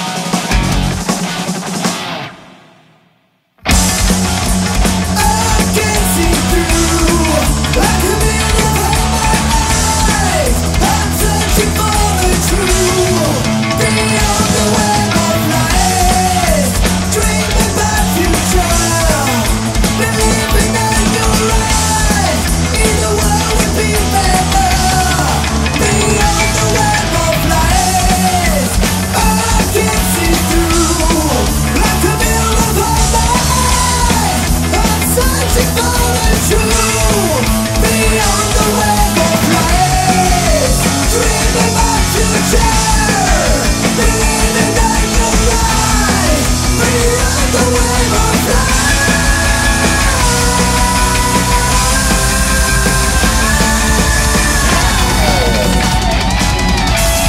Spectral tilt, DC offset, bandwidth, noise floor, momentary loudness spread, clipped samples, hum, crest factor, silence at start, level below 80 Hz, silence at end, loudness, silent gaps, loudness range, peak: -3.5 dB/octave; under 0.1%; 16.5 kHz; -56 dBFS; 2 LU; under 0.1%; none; 12 dB; 0 s; -18 dBFS; 0 s; -11 LUFS; none; 1 LU; 0 dBFS